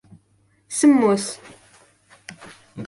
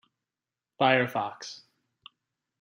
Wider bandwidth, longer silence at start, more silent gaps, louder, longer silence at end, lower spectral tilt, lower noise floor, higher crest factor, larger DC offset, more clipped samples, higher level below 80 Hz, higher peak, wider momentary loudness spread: second, 11.5 kHz vs 15.5 kHz; about the same, 0.7 s vs 0.8 s; neither; first, -19 LUFS vs -26 LUFS; second, 0 s vs 1.05 s; about the same, -4.5 dB/octave vs -5 dB/octave; second, -62 dBFS vs under -90 dBFS; about the same, 18 dB vs 22 dB; neither; neither; first, -66 dBFS vs -80 dBFS; first, -6 dBFS vs -10 dBFS; first, 25 LU vs 19 LU